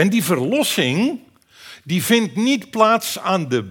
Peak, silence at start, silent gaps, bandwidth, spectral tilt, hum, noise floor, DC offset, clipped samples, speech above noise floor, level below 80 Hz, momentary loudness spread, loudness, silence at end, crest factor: 0 dBFS; 0 s; none; 19.5 kHz; -4.5 dB/octave; none; -44 dBFS; under 0.1%; under 0.1%; 26 dB; -68 dBFS; 7 LU; -18 LUFS; 0 s; 18 dB